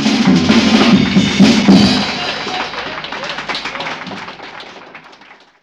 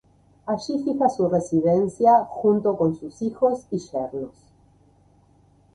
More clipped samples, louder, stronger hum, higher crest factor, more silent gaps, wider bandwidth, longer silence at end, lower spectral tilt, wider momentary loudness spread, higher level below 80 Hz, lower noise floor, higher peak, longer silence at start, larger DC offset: first, 0.3% vs under 0.1%; first, -13 LUFS vs -22 LUFS; neither; about the same, 14 dB vs 18 dB; neither; about the same, 10.5 kHz vs 11 kHz; second, 0.65 s vs 1.45 s; second, -5 dB/octave vs -7.5 dB/octave; first, 19 LU vs 12 LU; first, -42 dBFS vs -60 dBFS; second, -42 dBFS vs -57 dBFS; first, 0 dBFS vs -6 dBFS; second, 0 s vs 0.45 s; neither